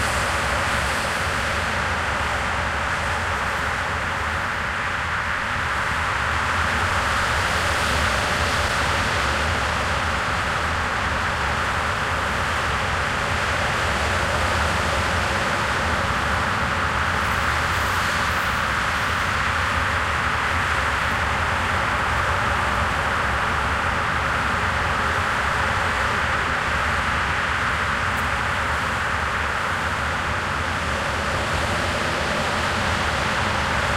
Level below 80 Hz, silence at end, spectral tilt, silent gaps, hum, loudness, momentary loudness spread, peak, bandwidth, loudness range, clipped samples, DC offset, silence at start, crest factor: -34 dBFS; 0 s; -3.5 dB/octave; none; none; -21 LUFS; 2 LU; -8 dBFS; 16 kHz; 2 LU; under 0.1%; under 0.1%; 0 s; 14 dB